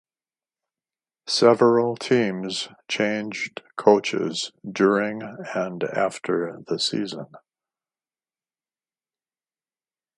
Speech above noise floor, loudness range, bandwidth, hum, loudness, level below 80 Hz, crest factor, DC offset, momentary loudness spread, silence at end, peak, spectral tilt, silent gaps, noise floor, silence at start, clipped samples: over 67 dB; 9 LU; 11.5 kHz; none; -23 LUFS; -72 dBFS; 24 dB; under 0.1%; 13 LU; 2.8 s; 0 dBFS; -4.5 dB/octave; none; under -90 dBFS; 1.25 s; under 0.1%